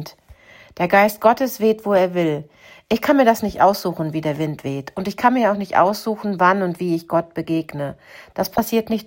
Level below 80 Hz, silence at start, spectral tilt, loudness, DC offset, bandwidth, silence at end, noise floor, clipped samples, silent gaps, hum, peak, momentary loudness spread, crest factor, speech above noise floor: -54 dBFS; 0 s; -6 dB/octave; -19 LUFS; under 0.1%; 16.5 kHz; 0 s; -47 dBFS; under 0.1%; none; none; -2 dBFS; 12 LU; 18 dB; 28 dB